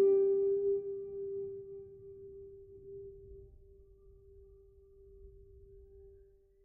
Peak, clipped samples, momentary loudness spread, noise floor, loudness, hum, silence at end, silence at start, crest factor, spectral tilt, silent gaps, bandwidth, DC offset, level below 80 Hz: -20 dBFS; under 0.1%; 28 LU; -63 dBFS; -34 LUFS; none; 0.55 s; 0 s; 16 dB; -9 dB/octave; none; 2.5 kHz; under 0.1%; -62 dBFS